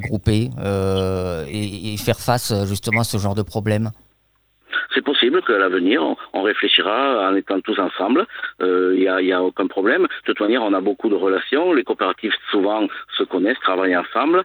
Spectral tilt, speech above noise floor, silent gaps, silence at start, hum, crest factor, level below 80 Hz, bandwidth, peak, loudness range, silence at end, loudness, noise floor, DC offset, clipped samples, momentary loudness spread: -5.5 dB/octave; 44 dB; none; 0 s; none; 18 dB; -48 dBFS; over 20 kHz; -2 dBFS; 4 LU; 0 s; -19 LUFS; -63 dBFS; under 0.1%; under 0.1%; 7 LU